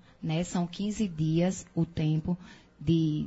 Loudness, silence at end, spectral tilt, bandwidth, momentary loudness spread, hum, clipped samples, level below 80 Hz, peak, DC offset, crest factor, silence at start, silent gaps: -30 LUFS; 0 s; -7 dB/octave; 8 kHz; 7 LU; none; under 0.1%; -54 dBFS; -14 dBFS; under 0.1%; 14 dB; 0.2 s; none